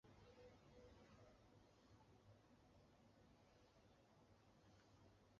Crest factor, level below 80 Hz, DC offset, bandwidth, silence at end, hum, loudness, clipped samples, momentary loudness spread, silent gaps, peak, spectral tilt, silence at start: 16 dB; -80 dBFS; under 0.1%; 7 kHz; 0 s; none; -69 LUFS; under 0.1%; 2 LU; none; -56 dBFS; -5 dB/octave; 0.05 s